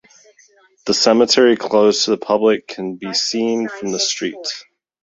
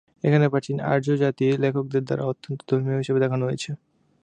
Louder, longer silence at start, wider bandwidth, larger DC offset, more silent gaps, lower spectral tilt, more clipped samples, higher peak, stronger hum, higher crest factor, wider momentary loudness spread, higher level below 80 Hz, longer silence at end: first, -16 LUFS vs -24 LUFS; first, 0.85 s vs 0.25 s; second, 8 kHz vs 9.6 kHz; neither; neither; second, -3 dB/octave vs -7.5 dB/octave; neither; first, -2 dBFS vs -6 dBFS; neither; about the same, 16 dB vs 18 dB; first, 14 LU vs 9 LU; about the same, -60 dBFS vs -64 dBFS; about the same, 0.4 s vs 0.45 s